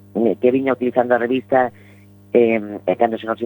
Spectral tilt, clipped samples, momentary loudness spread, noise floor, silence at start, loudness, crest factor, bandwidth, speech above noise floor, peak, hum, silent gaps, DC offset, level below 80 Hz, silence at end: -8.5 dB/octave; under 0.1%; 5 LU; -46 dBFS; 0.15 s; -18 LUFS; 18 dB; 19 kHz; 28 dB; -2 dBFS; 50 Hz at -45 dBFS; none; under 0.1%; -68 dBFS; 0 s